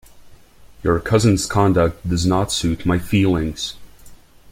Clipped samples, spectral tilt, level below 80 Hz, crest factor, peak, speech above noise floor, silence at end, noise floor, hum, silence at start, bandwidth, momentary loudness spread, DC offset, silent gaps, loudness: under 0.1%; -5.5 dB/octave; -38 dBFS; 18 dB; -2 dBFS; 27 dB; 0.35 s; -44 dBFS; none; 0.15 s; 16 kHz; 9 LU; under 0.1%; none; -19 LUFS